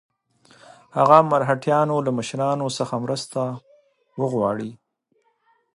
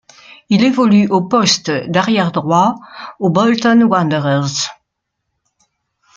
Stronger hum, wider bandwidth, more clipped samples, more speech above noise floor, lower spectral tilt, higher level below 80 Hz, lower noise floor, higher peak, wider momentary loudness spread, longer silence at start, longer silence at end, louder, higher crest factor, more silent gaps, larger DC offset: neither; first, 11.5 kHz vs 7.8 kHz; neither; second, 47 dB vs 61 dB; about the same, -6 dB/octave vs -5 dB/octave; second, -66 dBFS vs -58 dBFS; second, -68 dBFS vs -74 dBFS; about the same, 0 dBFS vs 0 dBFS; first, 15 LU vs 8 LU; first, 0.95 s vs 0.5 s; second, 1 s vs 1.45 s; second, -21 LUFS vs -14 LUFS; first, 22 dB vs 14 dB; neither; neither